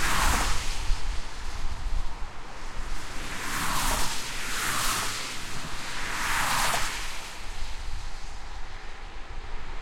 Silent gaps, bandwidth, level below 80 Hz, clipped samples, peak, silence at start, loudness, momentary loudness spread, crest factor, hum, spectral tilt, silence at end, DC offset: none; 16.5 kHz; -34 dBFS; under 0.1%; -10 dBFS; 0 s; -30 LUFS; 17 LU; 16 dB; none; -2 dB/octave; 0 s; under 0.1%